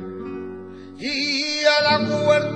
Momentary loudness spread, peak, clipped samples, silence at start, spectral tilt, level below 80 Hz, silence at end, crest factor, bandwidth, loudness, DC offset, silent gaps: 18 LU; -2 dBFS; under 0.1%; 0 s; -4 dB/octave; -62 dBFS; 0 s; 18 dB; 9.8 kHz; -19 LUFS; 0.2%; none